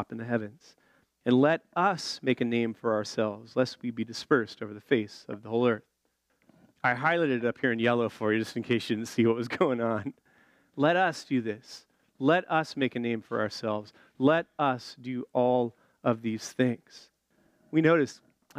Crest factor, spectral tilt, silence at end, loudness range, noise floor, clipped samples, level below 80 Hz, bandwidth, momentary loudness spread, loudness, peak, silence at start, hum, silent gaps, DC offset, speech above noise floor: 18 dB; -6 dB/octave; 0 s; 2 LU; -75 dBFS; under 0.1%; -76 dBFS; 13.5 kHz; 11 LU; -28 LUFS; -10 dBFS; 0 s; none; none; under 0.1%; 47 dB